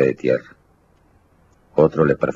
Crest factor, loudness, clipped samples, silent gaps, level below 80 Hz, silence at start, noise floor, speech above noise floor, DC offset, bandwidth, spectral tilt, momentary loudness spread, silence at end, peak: 20 dB; -19 LUFS; under 0.1%; none; -50 dBFS; 0 s; -57 dBFS; 39 dB; under 0.1%; 7.4 kHz; -9 dB/octave; 8 LU; 0.05 s; -2 dBFS